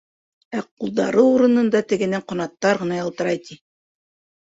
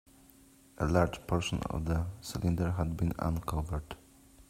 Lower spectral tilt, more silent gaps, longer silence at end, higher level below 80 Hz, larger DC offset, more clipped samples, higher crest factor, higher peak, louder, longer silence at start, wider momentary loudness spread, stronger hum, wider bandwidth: about the same, -6 dB/octave vs -6.5 dB/octave; first, 0.71-0.77 s vs none; first, 0.85 s vs 0.05 s; second, -64 dBFS vs -46 dBFS; neither; neither; about the same, 18 dB vs 22 dB; first, -4 dBFS vs -12 dBFS; first, -20 LUFS vs -33 LUFS; second, 0.5 s vs 0.8 s; first, 13 LU vs 9 LU; neither; second, 8 kHz vs 16 kHz